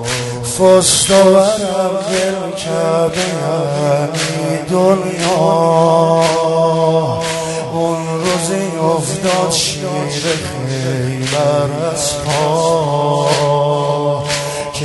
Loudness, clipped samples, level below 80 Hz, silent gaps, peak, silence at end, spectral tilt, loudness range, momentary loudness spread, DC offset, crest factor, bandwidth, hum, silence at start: -14 LUFS; under 0.1%; -46 dBFS; none; 0 dBFS; 0 s; -4.5 dB/octave; 4 LU; 9 LU; under 0.1%; 14 dB; 12 kHz; none; 0 s